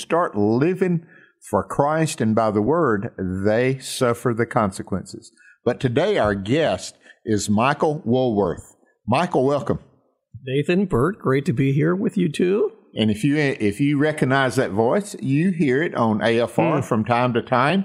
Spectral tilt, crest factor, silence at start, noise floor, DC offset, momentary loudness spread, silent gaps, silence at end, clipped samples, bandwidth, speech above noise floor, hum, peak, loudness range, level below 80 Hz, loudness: -6.5 dB/octave; 18 dB; 0 s; -46 dBFS; under 0.1%; 7 LU; none; 0 s; under 0.1%; 15 kHz; 26 dB; none; -2 dBFS; 3 LU; -52 dBFS; -21 LUFS